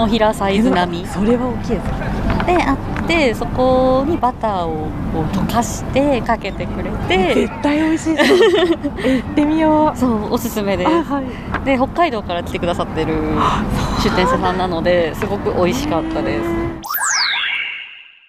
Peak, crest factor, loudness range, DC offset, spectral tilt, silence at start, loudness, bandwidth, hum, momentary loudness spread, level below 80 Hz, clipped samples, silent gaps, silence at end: -2 dBFS; 14 dB; 3 LU; under 0.1%; -5 dB/octave; 0 s; -17 LUFS; 15.5 kHz; none; 7 LU; -30 dBFS; under 0.1%; none; 0.25 s